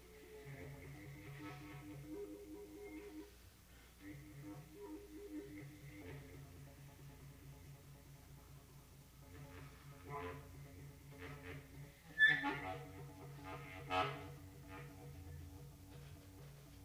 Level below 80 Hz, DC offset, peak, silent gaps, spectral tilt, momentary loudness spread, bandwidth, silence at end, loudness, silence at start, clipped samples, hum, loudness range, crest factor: -66 dBFS; under 0.1%; -22 dBFS; none; -4.5 dB/octave; 17 LU; over 20 kHz; 0 s; -45 LUFS; 0 s; under 0.1%; 60 Hz at -65 dBFS; 18 LU; 26 dB